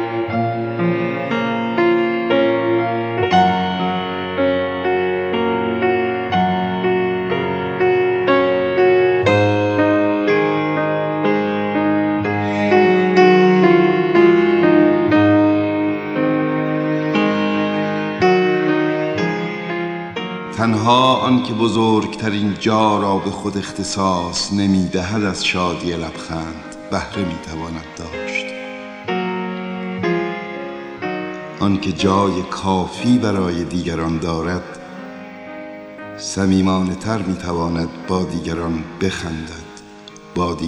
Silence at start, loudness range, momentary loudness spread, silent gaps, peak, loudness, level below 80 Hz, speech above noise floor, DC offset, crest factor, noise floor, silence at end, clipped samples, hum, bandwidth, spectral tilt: 0 s; 10 LU; 13 LU; none; 0 dBFS; -17 LUFS; -46 dBFS; 20 dB; under 0.1%; 18 dB; -39 dBFS; 0 s; under 0.1%; none; 10.5 kHz; -6 dB/octave